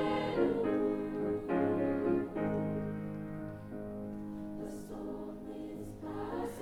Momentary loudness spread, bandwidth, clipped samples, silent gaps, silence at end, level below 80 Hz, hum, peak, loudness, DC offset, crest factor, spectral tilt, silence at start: 12 LU; 15.5 kHz; under 0.1%; none; 0 s; -56 dBFS; none; -18 dBFS; -36 LUFS; under 0.1%; 16 dB; -7.5 dB/octave; 0 s